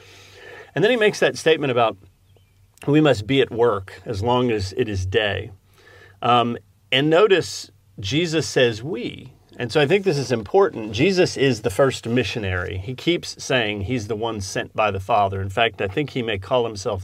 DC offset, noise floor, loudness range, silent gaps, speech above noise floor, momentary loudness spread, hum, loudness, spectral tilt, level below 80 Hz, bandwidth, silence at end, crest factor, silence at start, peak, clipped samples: under 0.1%; -55 dBFS; 3 LU; none; 35 dB; 12 LU; none; -21 LUFS; -5 dB/octave; -54 dBFS; 15 kHz; 0 s; 18 dB; 0.35 s; -2 dBFS; under 0.1%